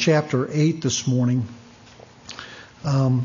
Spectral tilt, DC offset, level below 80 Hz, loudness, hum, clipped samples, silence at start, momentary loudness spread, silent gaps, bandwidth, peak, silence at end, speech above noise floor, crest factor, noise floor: -5.5 dB/octave; under 0.1%; -58 dBFS; -22 LUFS; none; under 0.1%; 0 s; 18 LU; none; 7.4 kHz; -6 dBFS; 0 s; 27 dB; 16 dB; -47 dBFS